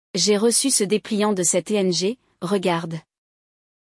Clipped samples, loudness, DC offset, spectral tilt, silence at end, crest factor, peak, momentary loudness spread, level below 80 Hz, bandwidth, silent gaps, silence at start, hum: under 0.1%; -20 LUFS; under 0.1%; -3.5 dB/octave; 0.85 s; 16 dB; -6 dBFS; 10 LU; -70 dBFS; 12 kHz; none; 0.15 s; none